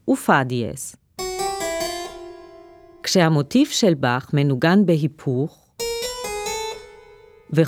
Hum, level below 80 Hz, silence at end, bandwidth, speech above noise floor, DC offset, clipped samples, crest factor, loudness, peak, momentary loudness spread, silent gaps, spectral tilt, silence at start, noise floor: none; -52 dBFS; 0 s; 19 kHz; 29 dB; under 0.1%; under 0.1%; 20 dB; -21 LUFS; -2 dBFS; 14 LU; none; -5 dB/octave; 0.05 s; -48 dBFS